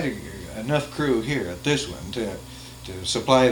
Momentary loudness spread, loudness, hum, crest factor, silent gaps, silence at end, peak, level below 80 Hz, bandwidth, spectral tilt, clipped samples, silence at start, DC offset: 15 LU; -25 LUFS; none; 22 dB; none; 0 s; -2 dBFS; -46 dBFS; 19 kHz; -4.5 dB/octave; under 0.1%; 0 s; under 0.1%